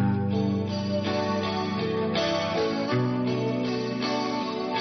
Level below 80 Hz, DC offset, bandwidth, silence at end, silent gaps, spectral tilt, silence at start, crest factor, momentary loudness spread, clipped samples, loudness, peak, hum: -60 dBFS; under 0.1%; 6.4 kHz; 0 s; none; -5 dB/octave; 0 s; 12 dB; 3 LU; under 0.1%; -27 LUFS; -14 dBFS; none